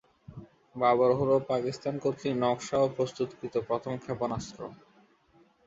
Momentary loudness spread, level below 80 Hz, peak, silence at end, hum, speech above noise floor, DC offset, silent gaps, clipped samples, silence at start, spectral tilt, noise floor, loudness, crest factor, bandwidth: 21 LU; -62 dBFS; -12 dBFS; 0.9 s; none; 35 dB; under 0.1%; none; under 0.1%; 0.3 s; -6 dB/octave; -64 dBFS; -29 LUFS; 18 dB; 7.8 kHz